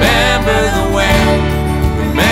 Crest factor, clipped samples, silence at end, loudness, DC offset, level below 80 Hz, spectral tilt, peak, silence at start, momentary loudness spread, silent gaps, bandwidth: 12 dB; under 0.1%; 0 s; -12 LUFS; under 0.1%; -18 dBFS; -5 dB/octave; 0 dBFS; 0 s; 4 LU; none; 16.5 kHz